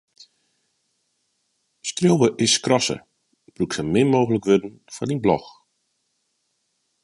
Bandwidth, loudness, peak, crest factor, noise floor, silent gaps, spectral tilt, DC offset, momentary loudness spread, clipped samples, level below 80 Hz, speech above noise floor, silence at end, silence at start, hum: 11.5 kHz; -21 LUFS; -4 dBFS; 20 dB; -72 dBFS; none; -4.5 dB/octave; under 0.1%; 13 LU; under 0.1%; -56 dBFS; 52 dB; 1.55 s; 1.85 s; none